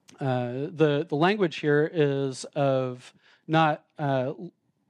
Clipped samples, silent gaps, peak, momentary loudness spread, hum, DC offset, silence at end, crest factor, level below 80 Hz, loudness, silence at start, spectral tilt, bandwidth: under 0.1%; none; -8 dBFS; 10 LU; none; under 0.1%; 0.4 s; 18 dB; -78 dBFS; -26 LUFS; 0.2 s; -6.5 dB/octave; 10.5 kHz